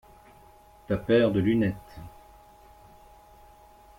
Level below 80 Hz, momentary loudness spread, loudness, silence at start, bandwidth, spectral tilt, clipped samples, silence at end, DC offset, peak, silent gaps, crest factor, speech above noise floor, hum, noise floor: -54 dBFS; 24 LU; -25 LUFS; 0.9 s; 16.5 kHz; -8 dB/octave; under 0.1%; 1.9 s; under 0.1%; -10 dBFS; none; 20 dB; 30 dB; none; -54 dBFS